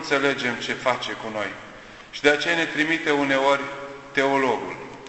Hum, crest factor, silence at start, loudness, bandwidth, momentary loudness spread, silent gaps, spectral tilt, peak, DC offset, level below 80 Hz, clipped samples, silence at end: none; 22 dB; 0 s; -23 LUFS; 8.4 kHz; 15 LU; none; -3.5 dB/octave; -2 dBFS; under 0.1%; -58 dBFS; under 0.1%; 0 s